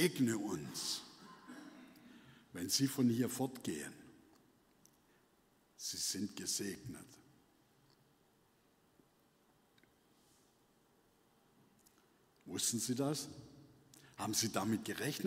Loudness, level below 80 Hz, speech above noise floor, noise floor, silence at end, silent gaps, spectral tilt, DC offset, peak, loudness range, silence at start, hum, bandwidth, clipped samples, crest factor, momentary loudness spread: -39 LUFS; -78 dBFS; 34 dB; -73 dBFS; 0 s; none; -3.5 dB/octave; under 0.1%; -18 dBFS; 6 LU; 0 s; none; 16 kHz; under 0.1%; 24 dB; 23 LU